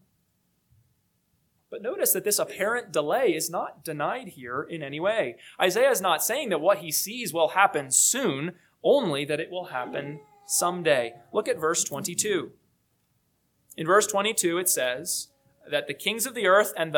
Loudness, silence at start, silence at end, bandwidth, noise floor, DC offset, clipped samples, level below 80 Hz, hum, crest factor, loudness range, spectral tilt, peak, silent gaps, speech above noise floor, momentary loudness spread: -25 LUFS; 1.7 s; 0 s; 19 kHz; -71 dBFS; under 0.1%; under 0.1%; -76 dBFS; none; 22 dB; 4 LU; -2 dB/octave; -4 dBFS; none; 46 dB; 13 LU